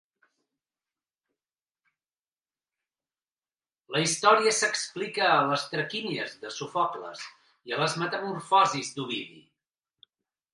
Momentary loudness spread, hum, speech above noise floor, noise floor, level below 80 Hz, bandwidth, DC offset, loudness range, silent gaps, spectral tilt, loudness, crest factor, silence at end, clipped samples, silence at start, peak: 15 LU; none; over 63 dB; under -90 dBFS; -80 dBFS; 11.5 kHz; under 0.1%; 4 LU; none; -2.5 dB/octave; -26 LUFS; 24 dB; 1.15 s; under 0.1%; 3.9 s; -6 dBFS